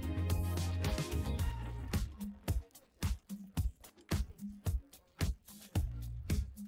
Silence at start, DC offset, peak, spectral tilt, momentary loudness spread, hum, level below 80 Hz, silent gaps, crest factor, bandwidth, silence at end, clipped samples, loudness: 0 s; under 0.1%; -24 dBFS; -5.5 dB/octave; 8 LU; none; -42 dBFS; none; 14 dB; 16.5 kHz; 0 s; under 0.1%; -40 LUFS